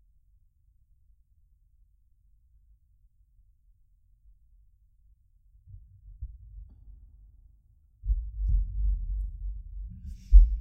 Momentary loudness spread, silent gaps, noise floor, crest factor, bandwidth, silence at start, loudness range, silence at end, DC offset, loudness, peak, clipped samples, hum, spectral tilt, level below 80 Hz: 31 LU; none; -64 dBFS; 26 dB; 0.3 kHz; 5.7 s; 22 LU; 0 s; under 0.1%; -31 LUFS; -6 dBFS; under 0.1%; none; -9 dB/octave; -30 dBFS